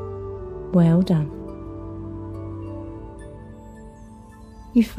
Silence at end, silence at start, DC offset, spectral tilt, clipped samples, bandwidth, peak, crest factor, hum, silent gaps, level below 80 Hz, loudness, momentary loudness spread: 0 s; 0 s; under 0.1%; -9 dB/octave; under 0.1%; 11.5 kHz; -6 dBFS; 20 dB; 50 Hz at -55 dBFS; none; -44 dBFS; -24 LUFS; 26 LU